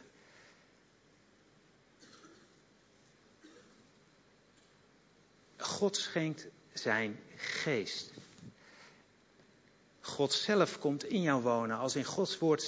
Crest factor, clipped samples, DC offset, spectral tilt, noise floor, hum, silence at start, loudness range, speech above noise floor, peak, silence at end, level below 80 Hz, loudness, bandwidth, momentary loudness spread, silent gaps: 22 dB; under 0.1%; under 0.1%; -4 dB/octave; -66 dBFS; none; 2 s; 7 LU; 33 dB; -16 dBFS; 0 s; -80 dBFS; -34 LUFS; 8 kHz; 23 LU; none